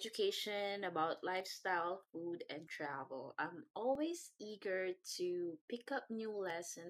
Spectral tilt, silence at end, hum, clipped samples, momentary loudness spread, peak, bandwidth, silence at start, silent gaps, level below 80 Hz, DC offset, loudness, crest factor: -3 dB/octave; 0 s; none; under 0.1%; 8 LU; -26 dBFS; 15 kHz; 0 s; 3.70-3.74 s, 5.61-5.68 s; under -90 dBFS; under 0.1%; -42 LUFS; 16 dB